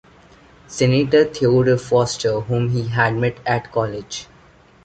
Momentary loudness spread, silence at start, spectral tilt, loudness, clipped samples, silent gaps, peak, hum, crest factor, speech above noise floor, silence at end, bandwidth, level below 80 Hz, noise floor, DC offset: 11 LU; 0.7 s; -6 dB/octave; -18 LUFS; under 0.1%; none; -2 dBFS; none; 18 dB; 31 dB; 0.6 s; 9 kHz; -48 dBFS; -49 dBFS; under 0.1%